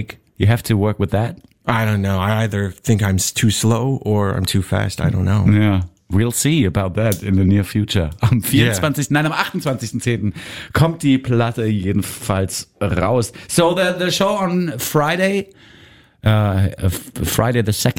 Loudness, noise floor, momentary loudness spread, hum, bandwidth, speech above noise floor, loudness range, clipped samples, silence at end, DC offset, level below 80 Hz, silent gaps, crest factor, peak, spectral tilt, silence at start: -18 LUFS; -47 dBFS; 7 LU; none; 16.5 kHz; 30 dB; 2 LU; under 0.1%; 0.05 s; 0.4%; -40 dBFS; none; 16 dB; 0 dBFS; -5.5 dB/octave; 0 s